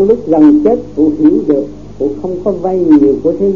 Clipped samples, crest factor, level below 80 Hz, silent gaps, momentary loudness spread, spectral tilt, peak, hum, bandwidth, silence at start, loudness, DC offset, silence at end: 0.5%; 10 dB; -40 dBFS; none; 10 LU; -10 dB/octave; 0 dBFS; none; 4.1 kHz; 0 s; -11 LUFS; 2%; 0 s